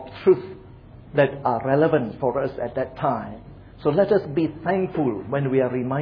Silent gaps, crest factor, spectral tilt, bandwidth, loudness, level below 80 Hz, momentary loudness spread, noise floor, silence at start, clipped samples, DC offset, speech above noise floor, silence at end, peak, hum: none; 18 dB; -10.5 dB/octave; 5.2 kHz; -23 LUFS; -52 dBFS; 8 LU; -44 dBFS; 0 s; under 0.1%; under 0.1%; 22 dB; 0 s; -4 dBFS; none